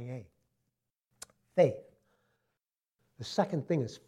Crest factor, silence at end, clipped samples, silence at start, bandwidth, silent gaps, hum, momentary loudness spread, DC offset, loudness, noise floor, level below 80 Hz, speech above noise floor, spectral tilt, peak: 22 dB; 0.1 s; under 0.1%; 0 s; 12.5 kHz; none; none; 24 LU; under 0.1%; -31 LUFS; -88 dBFS; -76 dBFS; 58 dB; -6.5 dB/octave; -14 dBFS